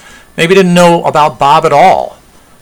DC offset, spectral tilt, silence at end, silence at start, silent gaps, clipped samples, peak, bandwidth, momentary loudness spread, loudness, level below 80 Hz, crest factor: under 0.1%; -5.5 dB/octave; 0.5 s; 0.35 s; none; 3%; 0 dBFS; 19 kHz; 8 LU; -7 LUFS; -42 dBFS; 8 dB